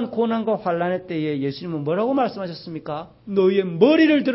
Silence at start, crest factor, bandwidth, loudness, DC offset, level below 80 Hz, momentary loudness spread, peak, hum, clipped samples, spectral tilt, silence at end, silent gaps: 0 s; 18 dB; 5.8 kHz; -21 LUFS; under 0.1%; -62 dBFS; 15 LU; -2 dBFS; none; under 0.1%; -10.5 dB/octave; 0 s; none